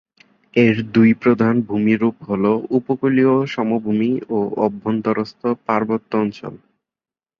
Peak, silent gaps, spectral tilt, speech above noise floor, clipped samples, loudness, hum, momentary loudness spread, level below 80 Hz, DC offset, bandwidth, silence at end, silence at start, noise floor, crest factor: -2 dBFS; none; -8.5 dB/octave; over 72 dB; under 0.1%; -18 LUFS; none; 7 LU; -58 dBFS; under 0.1%; 6.4 kHz; 0.85 s; 0.55 s; under -90 dBFS; 16 dB